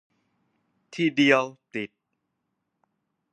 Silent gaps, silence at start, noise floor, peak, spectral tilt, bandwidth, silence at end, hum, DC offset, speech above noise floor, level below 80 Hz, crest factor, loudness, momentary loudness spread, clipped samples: none; 0.95 s; -79 dBFS; -4 dBFS; -5 dB/octave; 10 kHz; 1.45 s; none; under 0.1%; 55 dB; -80 dBFS; 24 dB; -22 LUFS; 18 LU; under 0.1%